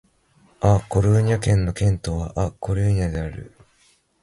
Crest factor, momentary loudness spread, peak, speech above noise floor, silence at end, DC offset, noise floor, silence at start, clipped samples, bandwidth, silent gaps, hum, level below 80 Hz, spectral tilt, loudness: 18 dB; 8 LU; -4 dBFS; 40 dB; 0.75 s; under 0.1%; -60 dBFS; 0.6 s; under 0.1%; 11.5 kHz; none; none; -34 dBFS; -7 dB/octave; -21 LUFS